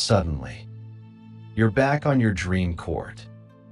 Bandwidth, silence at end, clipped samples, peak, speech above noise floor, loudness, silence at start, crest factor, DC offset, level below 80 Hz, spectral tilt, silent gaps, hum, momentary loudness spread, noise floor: 11.5 kHz; 0.3 s; under 0.1%; -4 dBFS; 21 dB; -24 LUFS; 0 s; 20 dB; under 0.1%; -44 dBFS; -6 dB/octave; none; none; 23 LU; -44 dBFS